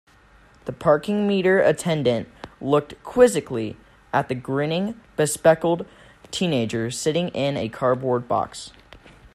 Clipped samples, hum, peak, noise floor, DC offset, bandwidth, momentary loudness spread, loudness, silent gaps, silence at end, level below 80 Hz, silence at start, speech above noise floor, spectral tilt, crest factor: under 0.1%; none; -2 dBFS; -53 dBFS; under 0.1%; 13.5 kHz; 14 LU; -22 LUFS; none; 0.05 s; -54 dBFS; 0.65 s; 31 dB; -5 dB/octave; 20 dB